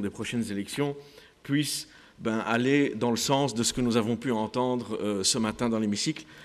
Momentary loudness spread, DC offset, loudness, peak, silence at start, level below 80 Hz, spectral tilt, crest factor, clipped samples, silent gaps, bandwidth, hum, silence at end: 8 LU; under 0.1%; -28 LUFS; -10 dBFS; 0 s; -58 dBFS; -4 dB/octave; 18 dB; under 0.1%; none; 14.5 kHz; none; 0 s